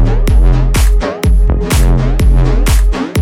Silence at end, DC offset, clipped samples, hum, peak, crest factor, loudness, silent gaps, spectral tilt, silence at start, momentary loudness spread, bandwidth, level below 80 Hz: 0 s; under 0.1%; under 0.1%; none; 0 dBFS; 8 dB; -12 LUFS; none; -6 dB/octave; 0 s; 2 LU; 16 kHz; -10 dBFS